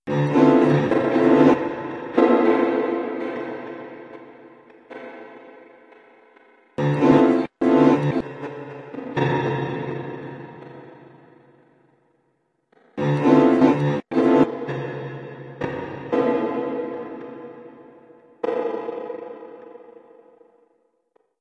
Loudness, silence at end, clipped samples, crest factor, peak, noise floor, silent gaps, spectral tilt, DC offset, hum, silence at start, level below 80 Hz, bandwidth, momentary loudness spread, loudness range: -20 LUFS; 1.65 s; under 0.1%; 20 dB; -2 dBFS; -69 dBFS; none; -8.5 dB/octave; under 0.1%; none; 0.05 s; -62 dBFS; 7.6 kHz; 23 LU; 13 LU